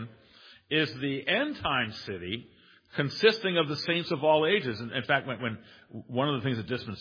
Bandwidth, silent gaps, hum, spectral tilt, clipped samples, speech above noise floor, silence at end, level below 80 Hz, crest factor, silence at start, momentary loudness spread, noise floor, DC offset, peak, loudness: 5.2 kHz; none; none; -6 dB/octave; under 0.1%; 27 dB; 0 s; -64 dBFS; 20 dB; 0 s; 13 LU; -56 dBFS; under 0.1%; -8 dBFS; -29 LUFS